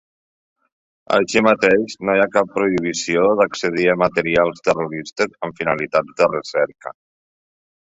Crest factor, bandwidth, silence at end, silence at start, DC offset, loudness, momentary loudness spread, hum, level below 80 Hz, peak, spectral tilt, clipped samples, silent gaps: 18 dB; 8 kHz; 1 s; 1.1 s; under 0.1%; -18 LUFS; 7 LU; none; -56 dBFS; -2 dBFS; -4.5 dB/octave; under 0.1%; none